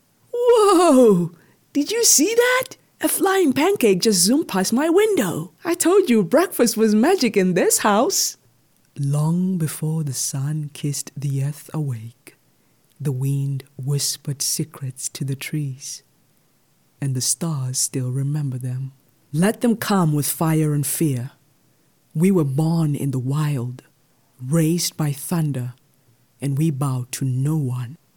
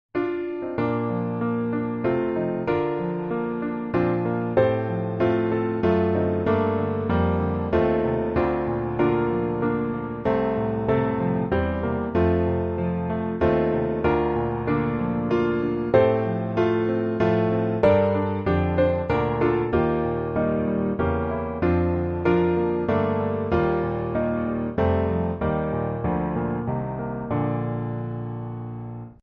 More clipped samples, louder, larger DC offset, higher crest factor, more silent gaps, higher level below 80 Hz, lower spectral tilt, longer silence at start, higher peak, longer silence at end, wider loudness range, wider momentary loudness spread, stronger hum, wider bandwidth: neither; first, -20 LUFS vs -24 LUFS; neither; about the same, 18 dB vs 20 dB; neither; second, -64 dBFS vs -42 dBFS; second, -5 dB/octave vs -7.5 dB/octave; first, 0.35 s vs 0.15 s; about the same, -2 dBFS vs -4 dBFS; about the same, 0.2 s vs 0.1 s; first, 9 LU vs 4 LU; first, 13 LU vs 6 LU; neither; first, 19 kHz vs 5.6 kHz